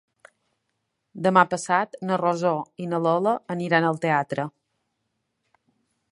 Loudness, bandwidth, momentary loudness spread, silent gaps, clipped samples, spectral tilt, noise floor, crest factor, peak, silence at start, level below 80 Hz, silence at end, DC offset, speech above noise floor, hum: -23 LUFS; 11 kHz; 10 LU; none; under 0.1%; -6 dB/octave; -77 dBFS; 24 dB; -2 dBFS; 1.15 s; -74 dBFS; 1.6 s; under 0.1%; 54 dB; none